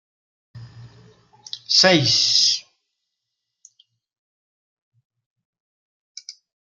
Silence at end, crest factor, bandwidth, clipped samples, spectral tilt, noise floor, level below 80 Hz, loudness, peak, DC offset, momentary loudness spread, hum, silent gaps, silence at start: 0.3 s; 24 dB; 12 kHz; under 0.1%; -2.5 dB/octave; -80 dBFS; -66 dBFS; -15 LUFS; -2 dBFS; under 0.1%; 25 LU; none; 4.18-4.92 s, 5.05-5.10 s, 5.26-5.36 s, 5.45-5.53 s, 5.60-6.15 s; 0.55 s